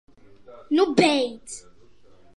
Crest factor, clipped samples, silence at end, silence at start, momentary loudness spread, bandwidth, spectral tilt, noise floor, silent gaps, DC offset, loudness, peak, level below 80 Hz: 22 dB; under 0.1%; 0.75 s; 0.5 s; 21 LU; 11.5 kHz; -4.5 dB/octave; -56 dBFS; none; 0.3%; -21 LUFS; -4 dBFS; -62 dBFS